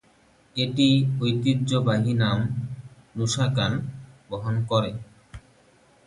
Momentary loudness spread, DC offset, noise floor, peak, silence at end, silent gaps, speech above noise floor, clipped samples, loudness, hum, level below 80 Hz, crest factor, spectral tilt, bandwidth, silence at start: 17 LU; under 0.1%; -59 dBFS; -8 dBFS; 0.65 s; none; 36 dB; under 0.1%; -24 LUFS; none; -54 dBFS; 16 dB; -6 dB/octave; 11.5 kHz; 0.55 s